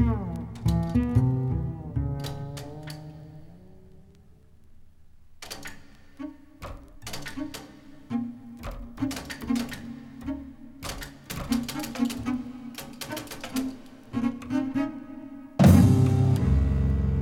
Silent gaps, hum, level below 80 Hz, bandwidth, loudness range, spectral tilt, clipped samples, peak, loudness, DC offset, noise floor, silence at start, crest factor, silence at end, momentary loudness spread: none; none; -36 dBFS; 17.5 kHz; 21 LU; -7 dB/octave; under 0.1%; -4 dBFS; -27 LUFS; under 0.1%; -53 dBFS; 0 s; 24 dB; 0 s; 20 LU